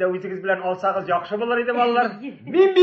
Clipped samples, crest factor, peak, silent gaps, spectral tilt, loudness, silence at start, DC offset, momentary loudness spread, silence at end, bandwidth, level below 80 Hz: under 0.1%; 16 dB; -4 dBFS; none; -6.5 dB/octave; -22 LUFS; 0 s; under 0.1%; 7 LU; 0 s; 6.2 kHz; -70 dBFS